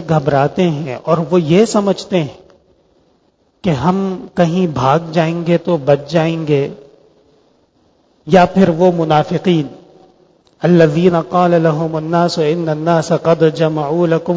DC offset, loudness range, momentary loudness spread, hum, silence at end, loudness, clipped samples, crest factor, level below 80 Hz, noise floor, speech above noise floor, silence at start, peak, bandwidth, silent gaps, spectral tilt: under 0.1%; 4 LU; 7 LU; none; 0 s; -14 LUFS; under 0.1%; 14 dB; -48 dBFS; -57 dBFS; 44 dB; 0 s; 0 dBFS; 8 kHz; none; -7 dB/octave